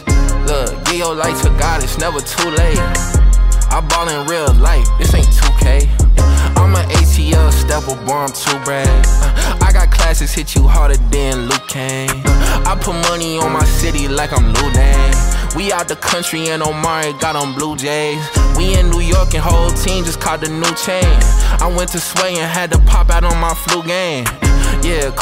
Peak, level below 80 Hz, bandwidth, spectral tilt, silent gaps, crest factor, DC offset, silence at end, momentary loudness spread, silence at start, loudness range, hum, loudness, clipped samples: -2 dBFS; -14 dBFS; 16 kHz; -4 dB/octave; none; 10 dB; under 0.1%; 0 s; 5 LU; 0 s; 3 LU; none; -14 LUFS; under 0.1%